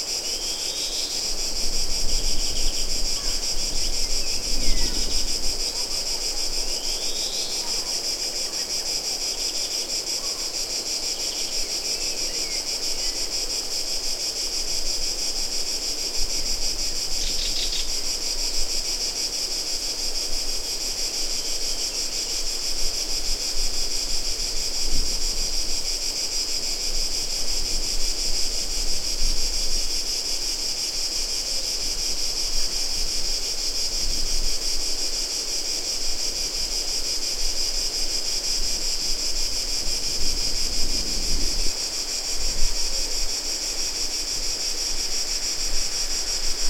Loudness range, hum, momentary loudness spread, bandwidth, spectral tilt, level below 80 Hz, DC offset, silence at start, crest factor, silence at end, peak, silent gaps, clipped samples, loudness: 1 LU; none; 1 LU; 16.5 kHz; 0 dB/octave; -30 dBFS; under 0.1%; 0 s; 18 dB; 0 s; -6 dBFS; none; under 0.1%; -24 LUFS